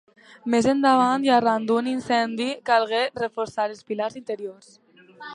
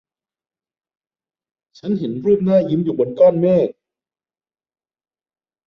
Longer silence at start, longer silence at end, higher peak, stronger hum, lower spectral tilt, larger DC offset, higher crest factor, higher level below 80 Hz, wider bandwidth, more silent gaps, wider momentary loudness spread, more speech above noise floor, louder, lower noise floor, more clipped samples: second, 0.45 s vs 1.85 s; second, 0 s vs 1.95 s; second, -6 dBFS vs -2 dBFS; neither; second, -4.5 dB/octave vs -10 dB/octave; neither; about the same, 18 dB vs 18 dB; about the same, -64 dBFS vs -60 dBFS; first, 11 kHz vs 6 kHz; neither; first, 14 LU vs 10 LU; second, 20 dB vs over 74 dB; second, -23 LUFS vs -17 LUFS; second, -43 dBFS vs under -90 dBFS; neither